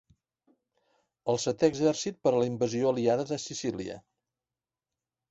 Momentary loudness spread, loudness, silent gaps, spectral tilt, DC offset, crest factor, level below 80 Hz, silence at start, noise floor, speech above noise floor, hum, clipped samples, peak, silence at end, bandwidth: 12 LU; -29 LUFS; none; -5 dB/octave; under 0.1%; 22 dB; -66 dBFS; 1.25 s; under -90 dBFS; over 62 dB; none; under 0.1%; -10 dBFS; 1.3 s; 8.2 kHz